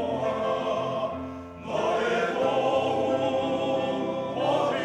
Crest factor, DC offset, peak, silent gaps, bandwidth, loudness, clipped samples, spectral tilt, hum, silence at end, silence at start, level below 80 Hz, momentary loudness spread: 14 dB; under 0.1%; -12 dBFS; none; 11 kHz; -27 LUFS; under 0.1%; -5.5 dB/octave; none; 0 s; 0 s; -64 dBFS; 7 LU